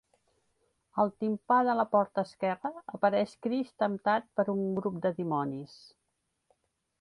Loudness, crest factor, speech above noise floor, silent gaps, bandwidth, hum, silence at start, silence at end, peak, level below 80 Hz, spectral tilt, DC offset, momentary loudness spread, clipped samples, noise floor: -30 LUFS; 20 dB; 50 dB; none; 11 kHz; none; 0.95 s; 1.35 s; -12 dBFS; -74 dBFS; -7.5 dB/octave; under 0.1%; 10 LU; under 0.1%; -80 dBFS